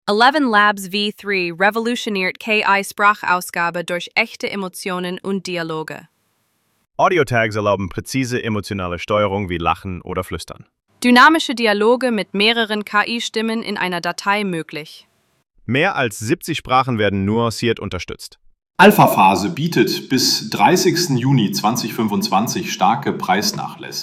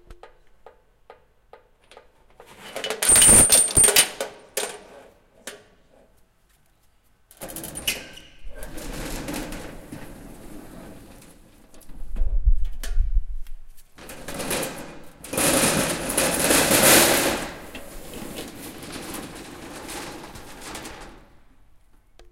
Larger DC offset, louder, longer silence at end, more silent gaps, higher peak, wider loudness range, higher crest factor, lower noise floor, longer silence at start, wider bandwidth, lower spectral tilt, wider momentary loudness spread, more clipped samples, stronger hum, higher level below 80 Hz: neither; about the same, -17 LUFS vs -18 LUFS; about the same, 0 s vs 0.1 s; neither; about the same, 0 dBFS vs -2 dBFS; second, 6 LU vs 21 LU; second, 18 dB vs 24 dB; first, -65 dBFS vs -60 dBFS; about the same, 0.05 s vs 0.1 s; about the same, 16.5 kHz vs 17 kHz; first, -4.5 dB/octave vs -1.5 dB/octave; second, 12 LU vs 28 LU; neither; neither; second, -50 dBFS vs -32 dBFS